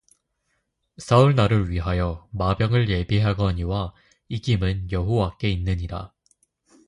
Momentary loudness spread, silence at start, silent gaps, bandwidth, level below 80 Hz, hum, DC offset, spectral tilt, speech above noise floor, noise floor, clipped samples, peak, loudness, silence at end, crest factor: 15 LU; 1 s; none; 10.5 kHz; -36 dBFS; none; under 0.1%; -7.5 dB/octave; 52 dB; -73 dBFS; under 0.1%; -4 dBFS; -23 LUFS; 0.8 s; 20 dB